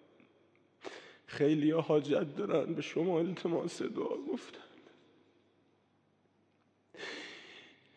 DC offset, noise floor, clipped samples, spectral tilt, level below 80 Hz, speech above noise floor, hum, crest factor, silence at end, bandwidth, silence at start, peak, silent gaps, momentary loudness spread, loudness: under 0.1%; -73 dBFS; under 0.1%; -6.5 dB/octave; -88 dBFS; 40 dB; none; 20 dB; 0.3 s; 9.6 kHz; 0.85 s; -18 dBFS; none; 21 LU; -34 LUFS